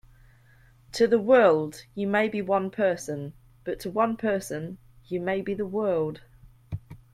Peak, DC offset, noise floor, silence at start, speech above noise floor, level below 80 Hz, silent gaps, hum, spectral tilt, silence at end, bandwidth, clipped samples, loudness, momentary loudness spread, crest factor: -6 dBFS; under 0.1%; -56 dBFS; 0.95 s; 31 dB; -58 dBFS; none; none; -6 dB/octave; 0.15 s; 15 kHz; under 0.1%; -26 LUFS; 20 LU; 20 dB